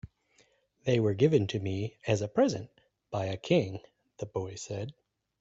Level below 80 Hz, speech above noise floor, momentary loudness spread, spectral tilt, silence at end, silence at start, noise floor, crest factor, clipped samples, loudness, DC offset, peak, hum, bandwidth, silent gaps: -64 dBFS; 38 dB; 14 LU; -6.5 dB/octave; 0.5 s; 0.05 s; -68 dBFS; 20 dB; under 0.1%; -31 LUFS; under 0.1%; -12 dBFS; none; 8 kHz; none